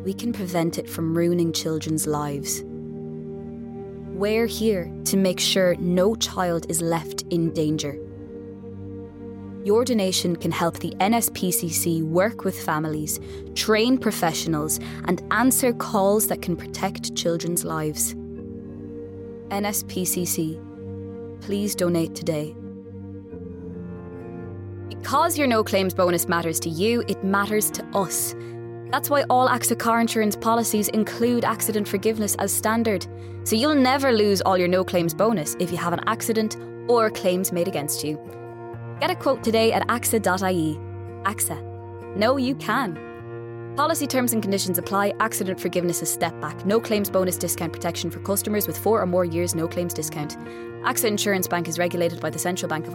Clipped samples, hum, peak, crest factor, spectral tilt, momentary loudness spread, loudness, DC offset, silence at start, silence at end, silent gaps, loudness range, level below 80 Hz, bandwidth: under 0.1%; none; -6 dBFS; 18 dB; -4 dB/octave; 16 LU; -23 LUFS; under 0.1%; 0 s; 0 s; none; 6 LU; -56 dBFS; 17 kHz